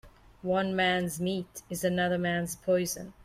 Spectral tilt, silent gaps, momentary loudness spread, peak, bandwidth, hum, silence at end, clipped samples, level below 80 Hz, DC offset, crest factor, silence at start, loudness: -4.5 dB/octave; none; 8 LU; -16 dBFS; 16 kHz; none; 0 s; under 0.1%; -58 dBFS; under 0.1%; 14 dB; 0.05 s; -30 LUFS